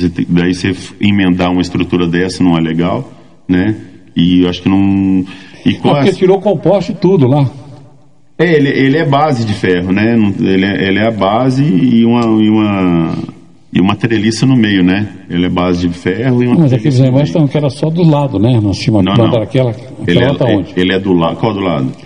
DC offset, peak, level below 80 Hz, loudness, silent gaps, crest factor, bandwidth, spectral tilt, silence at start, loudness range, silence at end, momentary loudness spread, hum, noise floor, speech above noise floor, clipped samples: 0.9%; 0 dBFS; -46 dBFS; -11 LUFS; none; 10 dB; 10.5 kHz; -7.5 dB/octave; 0 s; 2 LU; 0 s; 6 LU; none; -46 dBFS; 35 dB; 0.3%